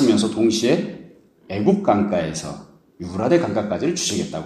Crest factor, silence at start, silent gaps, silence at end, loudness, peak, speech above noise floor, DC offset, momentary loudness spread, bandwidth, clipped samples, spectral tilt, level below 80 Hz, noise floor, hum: 18 dB; 0 s; none; 0 s; -20 LUFS; -2 dBFS; 26 dB; under 0.1%; 15 LU; 13.5 kHz; under 0.1%; -5 dB/octave; -54 dBFS; -46 dBFS; none